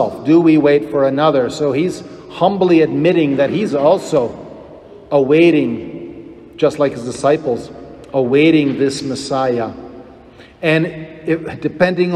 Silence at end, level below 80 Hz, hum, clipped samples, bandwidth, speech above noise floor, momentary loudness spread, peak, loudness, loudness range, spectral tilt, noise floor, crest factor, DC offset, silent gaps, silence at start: 0 s; -52 dBFS; none; under 0.1%; 11.5 kHz; 27 dB; 19 LU; 0 dBFS; -15 LUFS; 3 LU; -6.5 dB/octave; -41 dBFS; 14 dB; under 0.1%; none; 0 s